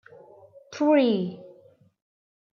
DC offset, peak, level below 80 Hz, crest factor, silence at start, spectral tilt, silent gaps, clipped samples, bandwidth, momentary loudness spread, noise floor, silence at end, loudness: under 0.1%; -10 dBFS; -80 dBFS; 18 dB; 0.7 s; -6.5 dB/octave; none; under 0.1%; 7 kHz; 23 LU; -56 dBFS; 1.05 s; -23 LUFS